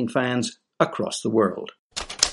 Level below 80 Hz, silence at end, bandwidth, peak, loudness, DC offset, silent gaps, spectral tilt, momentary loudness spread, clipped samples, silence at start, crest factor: -54 dBFS; 0 s; 11.5 kHz; -2 dBFS; -25 LUFS; under 0.1%; 1.79-1.90 s; -3.5 dB/octave; 11 LU; under 0.1%; 0 s; 24 dB